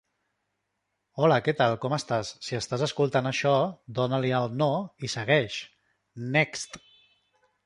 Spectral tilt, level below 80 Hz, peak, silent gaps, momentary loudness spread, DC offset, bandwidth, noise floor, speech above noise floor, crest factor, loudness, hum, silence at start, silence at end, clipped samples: -5 dB/octave; -66 dBFS; -8 dBFS; none; 13 LU; under 0.1%; 11.5 kHz; -80 dBFS; 53 dB; 20 dB; -27 LUFS; 50 Hz at -65 dBFS; 1.15 s; 0.9 s; under 0.1%